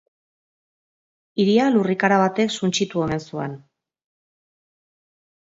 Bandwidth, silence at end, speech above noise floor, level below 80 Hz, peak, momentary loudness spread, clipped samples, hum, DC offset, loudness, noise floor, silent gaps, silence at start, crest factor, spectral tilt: 8 kHz; 1.9 s; over 70 dB; -60 dBFS; -2 dBFS; 13 LU; under 0.1%; none; under 0.1%; -20 LUFS; under -90 dBFS; none; 1.35 s; 20 dB; -5 dB/octave